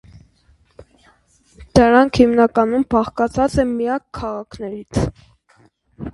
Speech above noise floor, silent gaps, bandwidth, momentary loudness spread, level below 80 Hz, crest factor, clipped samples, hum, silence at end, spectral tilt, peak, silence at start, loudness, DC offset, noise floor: 40 dB; none; 11.5 kHz; 15 LU; -38 dBFS; 18 dB; under 0.1%; none; 0.05 s; -6.5 dB/octave; 0 dBFS; 0.8 s; -17 LUFS; under 0.1%; -56 dBFS